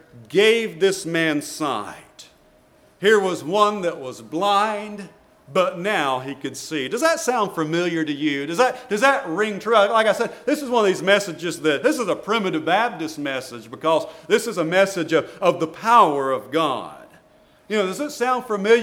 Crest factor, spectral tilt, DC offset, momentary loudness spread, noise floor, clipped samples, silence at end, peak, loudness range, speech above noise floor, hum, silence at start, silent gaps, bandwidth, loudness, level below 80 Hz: 20 dB; -4 dB/octave; under 0.1%; 10 LU; -55 dBFS; under 0.1%; 0 s; -2 dBFS; 3 LU; 34 dB; none; 0.15 s; none; 17 kHz; -21 LUFS; -66 dBFS